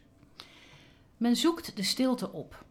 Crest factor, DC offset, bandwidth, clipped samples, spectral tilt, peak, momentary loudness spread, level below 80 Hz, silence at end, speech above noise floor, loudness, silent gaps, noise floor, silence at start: 18 dB; under 0.1%; 17.5 kHz; under 0.1%; -4 dB/octave; -16 dBFS; 24 LU; -64 dBFS; 0.1 s; 28 dB; -29 LUFS; none; -57 dBFS; 0.4 s